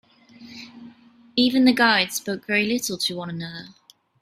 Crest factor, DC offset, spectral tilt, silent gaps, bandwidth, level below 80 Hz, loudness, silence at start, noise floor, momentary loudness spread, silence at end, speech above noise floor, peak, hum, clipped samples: 20 dB; under 0.1%; -3 dB/octave; none; 15.5 kHz; -64 dBFS; -21 LUFS; 0.4 s; -51 dBFS; 23 LU; 0.55 s; 29 dB; -4 dBFS; none; under 0.1%